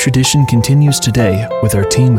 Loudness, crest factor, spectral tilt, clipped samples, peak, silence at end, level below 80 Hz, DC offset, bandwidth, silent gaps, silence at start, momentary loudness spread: -12 LUFS; 10 dB; -5 dB/octave; under 0.1%; 0 dBFS; 0 s; -34 dBFS; under 0.1%; 17 kHz; none; 0 s; 4 LU